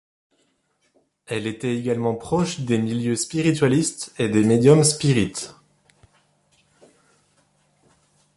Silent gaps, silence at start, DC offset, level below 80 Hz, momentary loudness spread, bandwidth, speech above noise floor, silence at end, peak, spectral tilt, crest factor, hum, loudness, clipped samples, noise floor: none; 1.3 s; under 0.1%; -54 dBFS; 12 LU; 11.5 kHz; 48 dB; 2.85 s; -4 dBFS; -5.5 dB/octave; 20 dB; none; -21 LUFS; under 0.1%; -68 dBFS